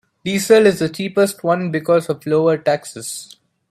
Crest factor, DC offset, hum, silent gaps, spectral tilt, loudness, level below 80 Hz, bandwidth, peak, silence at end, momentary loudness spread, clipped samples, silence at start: 16 dB; under 0.1%; none; none; -5 dB/octave; -17 LUFS; -60 dBFS; 15 kHz; 0 dBFS; 0.45 s; 15 LU; under 0.1%; 0.25 s